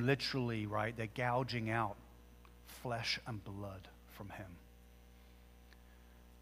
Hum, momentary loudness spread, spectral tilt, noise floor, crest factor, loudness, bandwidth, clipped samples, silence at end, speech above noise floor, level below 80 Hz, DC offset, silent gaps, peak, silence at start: 60 Hz at -60 dBFS; 25 LU; -5.5 dB/octave; -60 dBFS; 24 dB; -40 LUFS; 15.5 kHz; under 0.1%; 0 s; 21 dB; -62 dBFS; under 0.1%; none; -18 dBFS; 0 s